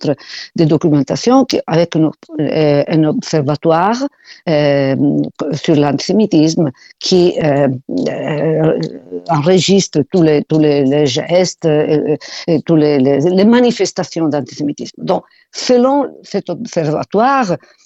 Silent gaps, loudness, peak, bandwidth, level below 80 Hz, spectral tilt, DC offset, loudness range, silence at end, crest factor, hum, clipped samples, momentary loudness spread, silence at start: none; -13 LUFS; 0 dBFS; 8.2 kHz; -52 dBFS; -6 dB/octave; under 0.1%; 2 LU; 0.3 s; 14 dB; none; under 0.1%; 9 LU; 0 s